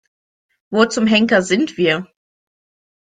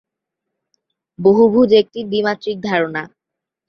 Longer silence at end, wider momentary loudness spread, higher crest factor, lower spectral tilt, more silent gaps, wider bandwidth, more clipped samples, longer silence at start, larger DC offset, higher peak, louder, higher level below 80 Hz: first, 1.1 s vs 0.6 s; second, 7 LU vs 11 LU; about the same, 18 dB vs 16 dB; second, -4.5 dB/octave vs -7 dB/octave; neither; first, 9.4 kHz vs 6.4 kHz; neither; second, 0.7 s vs 1.2 s; neither; about the same, -2 dBFS vs -2 dBFS; about the same, -16 LUFS vs -15 LUFS; about the same, -58 dBFS vs -58 dBFS